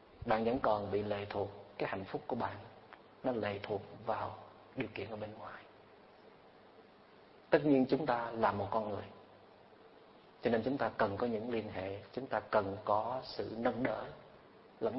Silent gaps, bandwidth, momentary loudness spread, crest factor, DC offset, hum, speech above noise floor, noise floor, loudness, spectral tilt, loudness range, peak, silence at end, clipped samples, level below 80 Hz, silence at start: none; 5.6 kHz; 15 LU; 26 dB; under 0.1%; none; 25 dB; -61 dBFS; -37 LUFS; -5 dB/octave; 7 LU; -12 dBFS; 0 s; under 0.1%; -66 dBFS; 0 s